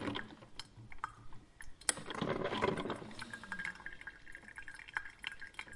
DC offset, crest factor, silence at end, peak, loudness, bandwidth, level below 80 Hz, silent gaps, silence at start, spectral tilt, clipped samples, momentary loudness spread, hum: under 0.1%; 32 dB; 0 s; -10 dBFS; -42 LUFS; 11.5 kHz; -62 dBFS; none; 0 s; -3 dB/octave; under 0.1%; 16 LU; none